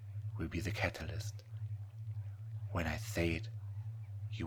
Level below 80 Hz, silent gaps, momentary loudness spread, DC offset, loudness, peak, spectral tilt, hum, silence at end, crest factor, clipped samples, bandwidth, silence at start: -54 dBFS; none; 9 LU; under 0.1%; -41 LUFS; -16 dBFS; -6 dB/octave; none; 0 s; 24 dB; under 0.1%; 18 kHz; 0 s